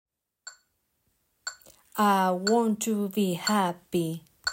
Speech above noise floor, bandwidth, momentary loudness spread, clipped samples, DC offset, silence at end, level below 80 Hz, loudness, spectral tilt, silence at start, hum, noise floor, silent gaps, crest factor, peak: 49 dB; 16.5 kHz; 21 LU; under 0.1%; under 0.1%; 0 s; -72 dBFS; -26 LUFS; -4.5 dB/octave; 0.45 s; none; -74 dBFS; none; 18 dB; -12 dBFS